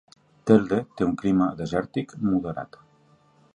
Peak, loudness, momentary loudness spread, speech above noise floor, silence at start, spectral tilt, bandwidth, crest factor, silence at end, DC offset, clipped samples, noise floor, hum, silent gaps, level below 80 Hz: -4 dBFS; -24 LUFS; 14 LU; 36 dB; 0.45 s; -8 dB/octave; 10 kHz; 22 dB; 0.9 s; under 0.1%; under 0.1%; -59 dBFS; none; none; -54 dBFS